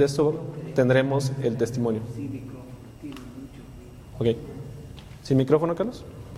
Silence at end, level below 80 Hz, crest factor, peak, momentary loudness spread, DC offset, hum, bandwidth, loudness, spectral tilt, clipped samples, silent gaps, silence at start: 0 s; -50 dBFS; 20 dB; -6 dBFS; 22 LU; under 0.1%; none; 14.5 kHz; -25 LUFS; -7 dB/octave; under 0.1%; none; 0 s